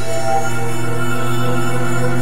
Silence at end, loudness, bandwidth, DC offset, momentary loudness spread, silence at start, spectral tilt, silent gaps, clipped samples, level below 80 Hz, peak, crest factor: 0 s; -20 LUFS; 16 kHz; 20%; 3 LU; 0 s; -5.5 dB/octave; none; under 0.1%; -44 dBFS; -4 dBFS; 14 dB